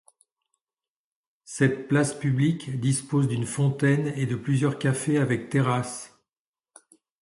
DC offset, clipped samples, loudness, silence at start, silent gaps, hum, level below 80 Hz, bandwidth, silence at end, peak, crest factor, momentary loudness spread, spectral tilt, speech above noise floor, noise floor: under 0.1%; under 0.1%; -25 LUFS; 1.5 s; none; none; -62 dBFS; 11.5 kHz; 1.15 s; -8 dBFS; 18 dB; 5 LU; -6 dB/octave; over 66 dB; under -90 dBFS